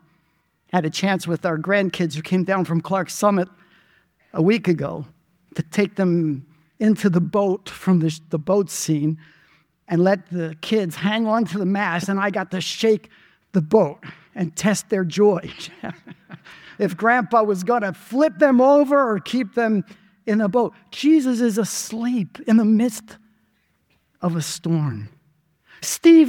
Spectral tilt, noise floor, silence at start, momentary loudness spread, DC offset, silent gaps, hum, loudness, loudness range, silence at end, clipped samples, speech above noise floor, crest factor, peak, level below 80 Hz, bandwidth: -5.5 dB/octave; -66 dBFS; 0.75 s; 12 LU; under 0.1%; none; none; -20 LUFS; 4 LU; 0 s; under 0.1%; 46 dB; 18 dB; -2 dBFS; -64 dBFS; 17.5 kHz